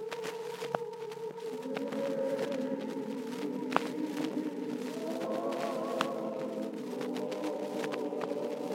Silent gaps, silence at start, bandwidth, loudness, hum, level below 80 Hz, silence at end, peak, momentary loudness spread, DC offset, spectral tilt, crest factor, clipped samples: none; 0 s; 16 kHz; -36 LUFS; none; -88 dBFS; 0 s; -6 dBFS; 5 LU; under 0.1%; -5 dB/octave; 30 dB; under 0.1%